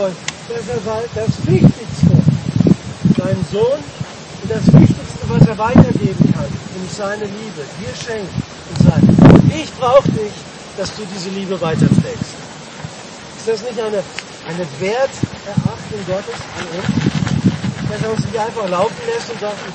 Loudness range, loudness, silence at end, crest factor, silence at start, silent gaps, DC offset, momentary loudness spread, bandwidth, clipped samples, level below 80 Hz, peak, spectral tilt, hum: 8 LU; -16 LUFS; 0 s; 16 dB; 0 s; none; under 0.1%; 16 LU; 8.8 kHz; under 0.1%; -36 dBFS; 0 dBFS; -7 dB/octave; none